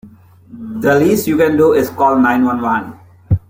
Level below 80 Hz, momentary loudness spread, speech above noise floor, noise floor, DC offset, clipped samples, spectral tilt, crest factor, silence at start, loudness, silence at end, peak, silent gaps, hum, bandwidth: -40 dBFS; 12 LU; 28 dB; -41 dBFS; under 0.1%; under 0.1%; -6.5 dB/octave; 12 dB; 0.05 s; -13 LUFS; 0.1 s; -2 dBFS; none; none; 16.5 kHz